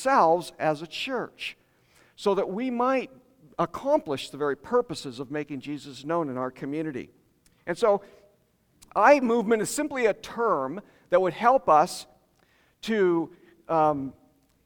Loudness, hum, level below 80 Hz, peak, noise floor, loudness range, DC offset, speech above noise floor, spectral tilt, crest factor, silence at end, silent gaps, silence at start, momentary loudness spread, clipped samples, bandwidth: -26 LUFS; none; -64 dBFS; -6 dBFS; -66 dBFS; 7 LU; under 0.1%; 41 dB; -5 dB/octave; 20 dB; 0.55 s; none; 0 s; 15 LU; under 0.1%; 19.5 kHz